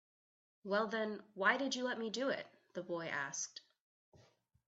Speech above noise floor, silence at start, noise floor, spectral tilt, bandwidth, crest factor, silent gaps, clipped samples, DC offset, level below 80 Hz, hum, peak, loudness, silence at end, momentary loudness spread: 31 dB; 0.65 s; -70 dBFS; -3 dB/octave; 8.2 kHz; 24 dB; 3.81-4.12 s; under 0.1%; under 0.1%; -88 dBFS; none; -16 dBFS; -39 LUFS; 0.55 s; 14 LU